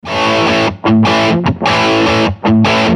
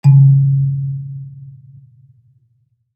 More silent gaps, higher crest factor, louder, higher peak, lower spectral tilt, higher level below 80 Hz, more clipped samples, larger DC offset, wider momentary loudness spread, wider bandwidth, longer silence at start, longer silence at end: neither; about the same, 10 dB vs 14 dB; about the same, -11 LUFS vs -13 LUFS; about the same, 0 dBFS vs -2 dBFS; second, -5.5 dB/octave vs -11 dB/octave; first, -38 dBFS vs -64 dBFS; neither; neither; second, 3 LU vs 24 LU; first, 10 kHz vs 2.6 kHz; about the same, 0.05 s vs 0.05 s; second, 0 s vs 1.45 s